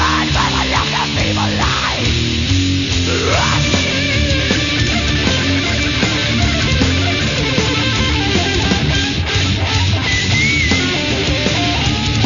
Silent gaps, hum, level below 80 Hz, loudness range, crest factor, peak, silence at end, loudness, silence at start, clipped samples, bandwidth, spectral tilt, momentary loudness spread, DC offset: none; none; -26 dBFS; 1 LU; 14 dB; 0 dBFS; 0 s; -14 LUFS; 0 s; under 0.1%; 7.4 kHz; -4 dB/octave; 2 LU; under 0.1%